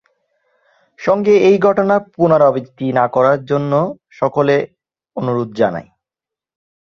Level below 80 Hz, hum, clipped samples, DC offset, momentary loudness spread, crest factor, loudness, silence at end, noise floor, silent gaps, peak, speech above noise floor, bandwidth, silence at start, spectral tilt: -56 dBFS; none; under 0.1%; under 0.1%; 12 LU; 16 dB; -15 LUFS; 1 s; -87 dBFS; none; 0 dBFS; 73 dB; 7 kHz; 1 s; -8 dB/octave